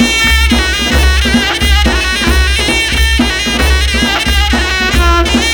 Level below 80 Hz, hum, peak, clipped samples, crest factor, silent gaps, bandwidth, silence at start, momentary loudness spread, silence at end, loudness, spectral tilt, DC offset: -14 dBFS; none; 0 dBFS; under 0.1%; 10 dB; none; over 20 kHz; 0 s; 2 LU; 0 s; -10 LUFS; -3.5 dB/octave; 0.5%